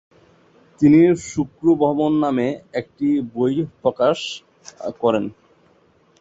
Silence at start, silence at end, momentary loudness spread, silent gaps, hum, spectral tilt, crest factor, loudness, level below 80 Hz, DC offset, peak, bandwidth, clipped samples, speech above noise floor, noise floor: 0.8 s; 0.9 s; 15 LU; none; none; -6.5 dB/octave; 16 dB; -19 LUFS; -56 dBFS; under 0.1%; -4 dBFS; 8 kHz; under 0.1%; 38 dB; -57 dBFS